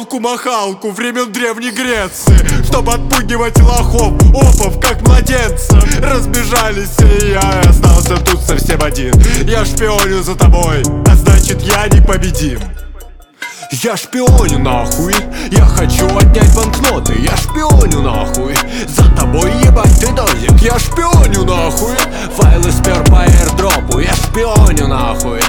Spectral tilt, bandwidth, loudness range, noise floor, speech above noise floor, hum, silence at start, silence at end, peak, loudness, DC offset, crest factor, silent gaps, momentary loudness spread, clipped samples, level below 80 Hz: -5 dB/octave; 19 kHz; 3 LU; -31 dBFS; 22 dB; none; 0 s; 0 s; 0 dBFS; -11 LUFS; under 0.1%; 8 dB; none; 7 LU; under 0.1%; -12 dBFS